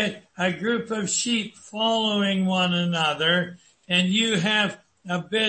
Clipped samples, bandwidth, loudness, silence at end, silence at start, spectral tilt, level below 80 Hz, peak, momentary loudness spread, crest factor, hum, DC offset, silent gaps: under 0.1%; 8.8 kHz; -23 LUFS; 0 s; 0 s; -3.5 dB/octave; -66 dBFS; -8 dBFS; 8 LU; 16 dB; none; under 0.1%; none